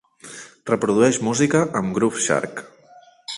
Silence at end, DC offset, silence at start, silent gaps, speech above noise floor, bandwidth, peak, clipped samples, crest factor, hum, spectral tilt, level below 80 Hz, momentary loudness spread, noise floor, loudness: 0 s; under 0.1%; 0.25 s; none; 30 dB; 11.5 kHz; -4 dBFS; under 0.1%; 18 dB; none; -4.5 dB/octave; -58 dBFS; 20 LU; -50 dBFS; -20 LUFS